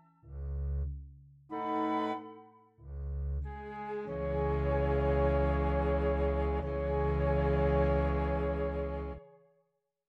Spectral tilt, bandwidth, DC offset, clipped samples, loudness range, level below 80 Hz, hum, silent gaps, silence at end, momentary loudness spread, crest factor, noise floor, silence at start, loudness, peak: -9.5 dB/octave; 4.7 kHz; under 0.1%; under 0.1%; 7 LU; -38 dBFS; none; none; 0.8 s; 14 LU; 14 dB; -78 dBFS; 0.25 s; -33 LUFS; -18 dBFS